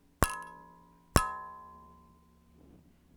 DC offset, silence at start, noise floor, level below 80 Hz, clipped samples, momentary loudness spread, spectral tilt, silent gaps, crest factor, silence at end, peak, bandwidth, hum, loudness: under 0.1%; 0.2 s; -62 dBFS; -46 dBFS; under 0.1%; 23 LU; -4 dB/octave; none; 36 dB; 1.4 s; 0 dBFS; over 20 kHz; none; -33 LUFS